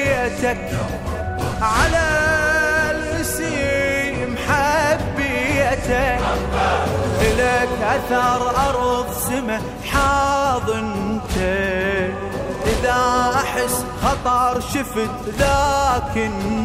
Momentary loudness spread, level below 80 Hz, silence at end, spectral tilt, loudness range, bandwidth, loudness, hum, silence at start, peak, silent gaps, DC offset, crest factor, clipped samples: 7 LU; -32 dBFS; 0 s; -4.5 dB/octave; 2 LU; 16 kHz; -19 LUFS; none; 0 s; -4 dBFS; none; under 0.1%; 16 dB; under 0.1%